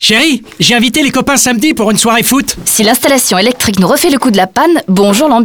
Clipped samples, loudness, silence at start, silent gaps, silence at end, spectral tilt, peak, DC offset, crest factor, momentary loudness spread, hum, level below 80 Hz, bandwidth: under 0.1%; -8 LUFS; 0 s; none; 0 s; -3 dB/octave; 0 dBFS; under 0.1%; 8 dB; 3 LU; none; -40 dBFS; over 20 kHz